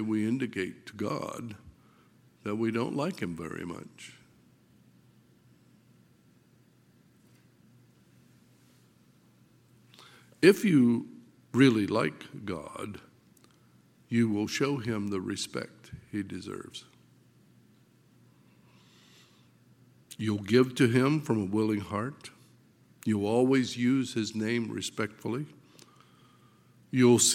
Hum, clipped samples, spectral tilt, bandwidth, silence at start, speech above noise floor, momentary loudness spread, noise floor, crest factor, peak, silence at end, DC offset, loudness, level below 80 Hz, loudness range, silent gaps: none; under 0.1%; -5 dB/octave; 16.5 kHz; 0 s; 34 dB; 20 LU; -63 dBFS; 24 dB; -6 dBFS; 0 s; under 0.1%; -29 LUFS; -70 dBFS; 15 LU; none